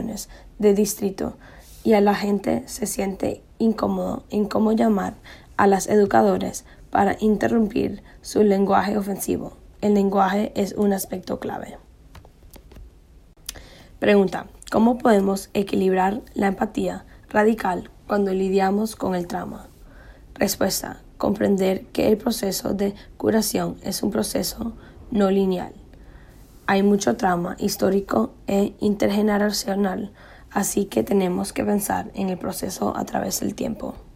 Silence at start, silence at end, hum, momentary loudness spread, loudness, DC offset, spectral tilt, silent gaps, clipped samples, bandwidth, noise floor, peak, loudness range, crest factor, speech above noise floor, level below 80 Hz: 0 s; 0.05 s; none; 12 LU; -22 LUFS; under 0.1%; -5.5 dB/octave; none; under 0.1%; 16 kHz; -50 dBFS; -4 dBFS; 4 LU; 18 dB; 28 dB; -48 dBFS